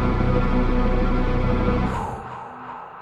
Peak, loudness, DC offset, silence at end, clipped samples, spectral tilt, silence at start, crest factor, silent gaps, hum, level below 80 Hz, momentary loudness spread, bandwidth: -6 dBFS; -23 LUFS; under 0.1%; 0 s; under 0.1%; -8.5 dB/octave; 0 s; 14 dB; none; none; -24 dBFS; 14 LU; 7.2 kHz